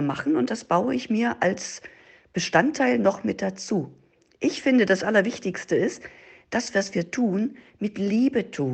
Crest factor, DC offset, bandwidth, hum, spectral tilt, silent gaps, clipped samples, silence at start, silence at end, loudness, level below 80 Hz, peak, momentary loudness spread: 20 dB; under 0.1%; 8.8 kHz; none; -5 dB/octave; none; under 0.1%; 0 s; 0 s; -24 LUFS; -64 dBFS; -6 dBFS; 11 LU